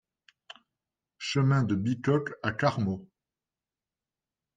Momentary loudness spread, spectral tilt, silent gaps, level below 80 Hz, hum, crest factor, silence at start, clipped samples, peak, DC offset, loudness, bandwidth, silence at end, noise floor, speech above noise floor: 8 LU; -6.5 dB/octave; none; -66 dBFS; none; 20 dB; 1.2 s; under 0.1%; -12 dBFS; under 0.1%; -29 LUFS; 7.8 kHz; 1.5 s; under -90 dBFS; over 63 dB